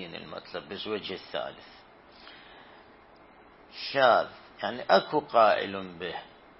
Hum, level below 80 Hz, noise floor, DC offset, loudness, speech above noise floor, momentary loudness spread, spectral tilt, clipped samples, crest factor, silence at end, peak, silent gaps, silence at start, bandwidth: none; -68 dBFS; -55 dBFS; under 0.1%; -28 LUFS; 27 dB; 25 LU; -7.5 dB/octave; under 0.1%; 22 dB; 0.3 s; -8 dBFS; none; 0 s; 5.8 kHz